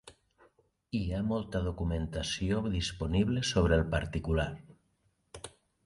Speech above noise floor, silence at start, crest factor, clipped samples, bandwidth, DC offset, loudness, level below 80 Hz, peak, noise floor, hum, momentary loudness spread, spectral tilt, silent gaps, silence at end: 43 dB; 0.05 s; 18 dB; under 0.1%; 11.5 kHz; under 0.1%; -32 LUFS; -42 dBFS; -14 dBFS; -74 dBFS; none; 17 LU; -5.5 dB/octave; none; 0.35 s